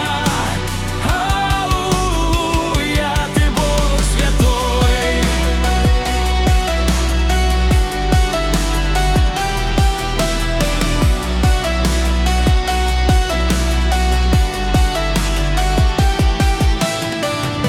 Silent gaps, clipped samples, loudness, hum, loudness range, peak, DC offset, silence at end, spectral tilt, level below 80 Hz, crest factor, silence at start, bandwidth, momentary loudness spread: none; under 0.1%; -16 LUFS; none; 1 LU; -4 dBFS; under 0.1%; 0 s; -4.5 dB/octave; -18 dBFS; 12 dB; 0 s; 15.5 kHz; 3 LU